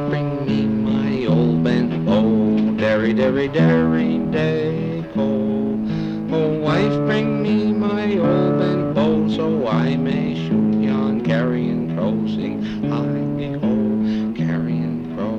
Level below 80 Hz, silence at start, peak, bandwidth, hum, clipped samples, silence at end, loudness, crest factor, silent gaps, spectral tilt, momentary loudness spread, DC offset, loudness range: -46 dBFS; 0 s; -8 dBFS; 6.8 kHz; none; under 0.1%; 0 s; -19 LUFS; 12 dB; none; -8.5 dB/octave; 5 LU; under 0.1%; 3 LU